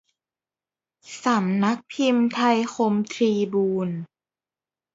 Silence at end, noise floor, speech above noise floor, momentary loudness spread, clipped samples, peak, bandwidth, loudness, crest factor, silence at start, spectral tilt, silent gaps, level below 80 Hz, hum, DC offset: 0.9 s; under -90 dBFS; over 68 dB; 9 LU; under 0.1%; -8 dBFS; 8 kHz; -23 LUFS; 18 dB; 1.05 s; -6 dB/octave; none; -72 dBFS; none; under 0.1%